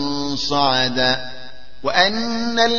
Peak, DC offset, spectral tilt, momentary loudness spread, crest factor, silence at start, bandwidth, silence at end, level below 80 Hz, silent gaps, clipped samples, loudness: 0 dBFS; 4%; -3.5 dB/octave; 11 LU; 20 dB; 0 s; 7.2 kHz; 0 s; -48 dBFS; none; under 0.1%; -18 LUFS